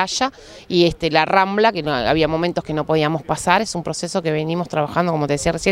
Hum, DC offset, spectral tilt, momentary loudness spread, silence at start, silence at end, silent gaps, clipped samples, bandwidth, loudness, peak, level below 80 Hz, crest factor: none; under 0.1%; -4.5 dB/octave; 6 LU; 0 s; 0 s; none; under 0.1%; 15 kHz; -19 LUFS; 0 dBFS; -44 dBFS; 18 dB